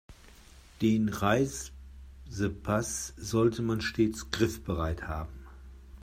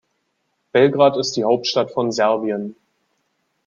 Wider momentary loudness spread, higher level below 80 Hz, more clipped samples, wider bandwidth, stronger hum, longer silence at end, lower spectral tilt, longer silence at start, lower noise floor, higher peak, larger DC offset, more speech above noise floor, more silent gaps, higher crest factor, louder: first, 22 LU vs 10 LU; first, -48 dBFS vs -66 dBFS; neither; first, 16 kHz vs 7.4 kHz; neither; second, 0 s vs 0.95 s; about the same, -5.5 dB/octave vs -4.5 dB/octave; second, 0.1 s vs 0.75 s; second, -54 dBFS vs -71 dBFS; second, -12 dBFS vs -2 dBFS; neither; second, 24 dB vs 53 dB; neither; about the same, 20 dB vs 18 dB; second, -30 LUFS vs -18 LUFS